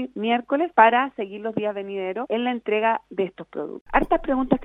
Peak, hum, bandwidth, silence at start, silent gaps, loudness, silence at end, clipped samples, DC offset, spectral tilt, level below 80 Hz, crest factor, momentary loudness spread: 0 dBFS; none; 4 kHz; 0 s; 3.81-3.86 s; -23 LUFS; 0 s; under 0.1%; under 0.1%; -7.5 dB/octave; -44 dBFS; 22 dB; 12 LU